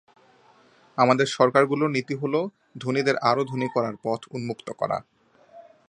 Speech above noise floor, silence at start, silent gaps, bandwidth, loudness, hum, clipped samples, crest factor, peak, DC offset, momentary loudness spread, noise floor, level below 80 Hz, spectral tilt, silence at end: 33 dB; 0.95 s; none; 10.5 kHz; -24 LUFS; none; under 0.1%; 22 dB; -2 dBFS; under 0.1%; 13 LU; -57 dBFS; -70 dBFS; -5.5 dB/octave; 0.3 s